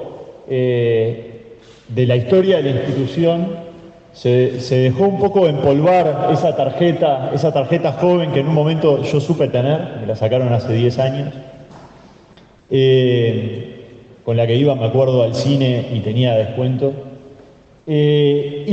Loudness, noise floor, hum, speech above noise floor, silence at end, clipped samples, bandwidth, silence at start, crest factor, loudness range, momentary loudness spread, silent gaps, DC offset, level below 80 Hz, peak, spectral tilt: -16 LUFS; -46 dBFS; none; 31 dB; 0 s; under 0.1%; 8 kHz; 0 s; 14 dB; 4 LU; 11 LU; none; under 0.1%; -54 dBFS; -2 dBFS; -8 dB/octave